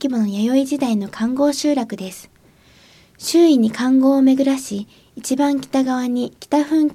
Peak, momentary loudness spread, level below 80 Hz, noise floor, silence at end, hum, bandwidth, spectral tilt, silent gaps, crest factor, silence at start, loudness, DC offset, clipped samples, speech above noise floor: -4 dBFS; 15 LU; -60 dBFS; -51 dBFS; 0 s; none; 15 kHz; -5 dB/octave; none; 14 dB; 0 s; -18 LUFS; under 0.1%; under 0.1%; 34 dB